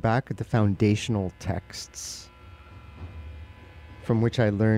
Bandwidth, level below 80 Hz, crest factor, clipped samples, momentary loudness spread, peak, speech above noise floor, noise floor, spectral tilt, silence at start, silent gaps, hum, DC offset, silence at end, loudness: 13.5 kHz; -48 dBFS; 18 dB; under 0.1%; 24 LU; -10 dBFS; 22 dB; -47 dBFS; -6.5 dB/octave; 0.05 s; none; none; under 0.1%; 0 s; -27 LUFS